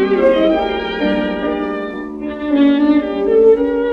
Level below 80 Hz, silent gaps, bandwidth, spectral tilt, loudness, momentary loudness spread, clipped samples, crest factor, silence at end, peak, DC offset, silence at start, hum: -42 dBFS; none; 5.6 kHz; -7.5 dB/octave; -15 LUFS; 12 LU; under 0.1%; 14 dB; 0 s; -2 dBFS; under 0.1%; 0 s; none